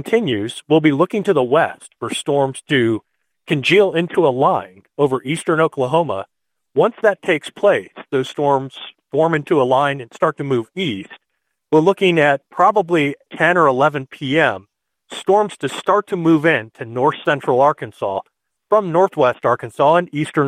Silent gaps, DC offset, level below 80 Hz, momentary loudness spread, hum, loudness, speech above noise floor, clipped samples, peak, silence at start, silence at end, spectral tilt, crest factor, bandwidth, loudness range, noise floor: none; under 0.1%; -64 dBFS; 10 LU; none; -17 LUFS; 57 dB; under 0.1%; -2 dBFS; 0 s; 0 s; -6 dB/octave; 16 dB; 14 kHz; 3 LU; -74 dBFS